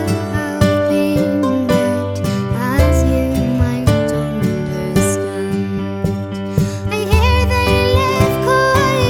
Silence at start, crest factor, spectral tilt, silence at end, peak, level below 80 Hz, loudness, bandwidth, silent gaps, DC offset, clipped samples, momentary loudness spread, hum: 0 s; 14 dB; -6 dB/octave; 0 s; 0 dBFS; -24 dBFS; -16 LUFS; 18 kHz; none; under 0.1%; under 0.1%; 7 LU; none